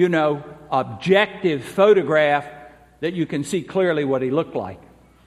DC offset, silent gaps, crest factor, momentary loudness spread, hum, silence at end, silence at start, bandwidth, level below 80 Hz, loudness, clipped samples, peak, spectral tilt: under 0.1%; none; 18 dB; 13 LU; none; 0.5 s; 0 s; 13 kHz; -58 dBFS; -20 LUFS; under 0.1%; -2 dBFS; -6 dB/octave